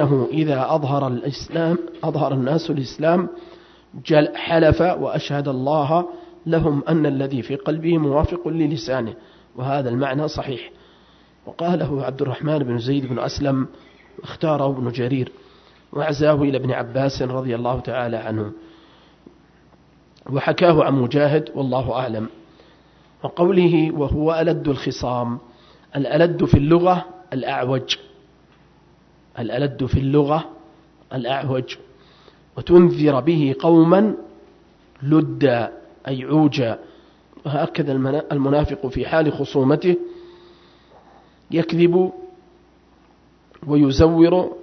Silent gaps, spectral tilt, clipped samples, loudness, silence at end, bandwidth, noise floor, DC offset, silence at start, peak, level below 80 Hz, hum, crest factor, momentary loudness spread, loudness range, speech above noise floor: none; -8 dB/octave; under 0.1%; -20 LUFS; 0 s; 6.4 kHz; -54 dBFS; under 0.1%; 0 s; 0 dBFS; -42 dBFS; none; 20 dB; 15 LU; 6 LU; 35 dB